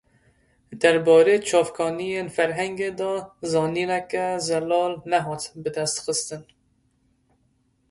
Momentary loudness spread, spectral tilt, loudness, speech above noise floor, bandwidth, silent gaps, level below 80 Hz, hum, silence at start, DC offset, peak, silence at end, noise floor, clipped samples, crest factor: 12 LU; -4 dB/octave; -23 LUFS; 44 dB; 11.5 kHz; none; -64 dBFS; none; 0.7 s; under 0.1%; -4 dBFS; 1.5 s; -66 dBFS; under 0.1%; 20 dB